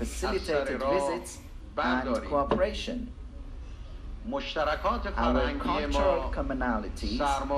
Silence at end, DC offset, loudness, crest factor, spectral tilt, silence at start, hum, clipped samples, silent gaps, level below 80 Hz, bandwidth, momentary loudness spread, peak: 0 s; under 0.1%; -29 LUFS; 18 dB; -5 dB/octave; 0 s; none; under 0.1%; none; -38 dBFS; 13.5 kHz; 18 LU; -12 dBFS